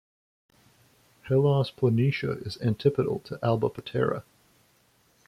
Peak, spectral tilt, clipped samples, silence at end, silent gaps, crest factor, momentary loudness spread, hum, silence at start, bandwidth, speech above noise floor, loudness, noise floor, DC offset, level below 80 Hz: -10 dBFS; -8.5 dB/octave; under 0.1%; 1.05 s; none; 18 dB; 7 LU; none; 1.25 s; 12 kHz; 39 dB; -27 LUFS; -65 dBFS; under 0.1%; -62 dBFS